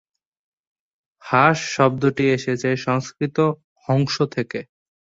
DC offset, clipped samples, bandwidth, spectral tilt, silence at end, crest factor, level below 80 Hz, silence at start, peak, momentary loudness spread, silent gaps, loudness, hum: under 0.1%; under 0.1%; 7.8 kHz; -6 dB/octave; 0.5 s; 20 dB; -60 dBFS; 1.25 s; -2 dBFS; 9 LU; 3.64-3.76 s; -20 LUFS; none